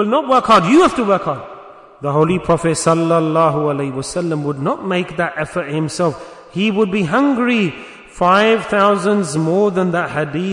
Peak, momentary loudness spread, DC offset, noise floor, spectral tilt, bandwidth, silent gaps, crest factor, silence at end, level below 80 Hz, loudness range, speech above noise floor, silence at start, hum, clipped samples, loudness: -2 dBFS; 10 LU; under 0.1%; -38 dBFS; -5.5 dB/octave; 11 kHz; none; 14 dB; 0 s; -48 dBFS; 4 LU; 23 dB; 0 s; none; under 0.1%; -16 LUFS